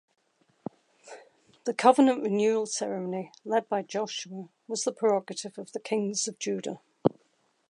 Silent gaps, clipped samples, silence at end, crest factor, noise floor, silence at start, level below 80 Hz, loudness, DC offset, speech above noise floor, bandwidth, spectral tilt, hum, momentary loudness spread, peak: none; under 0.1%; 0.6 s; 24 dB; -70 dBFS; 1.05 s; -76 dBFS; -28 LUFS; under 0.1%; 42 dB; 11.5 kHz; -4 dB/octave; none; 21 LU; -6 dBFS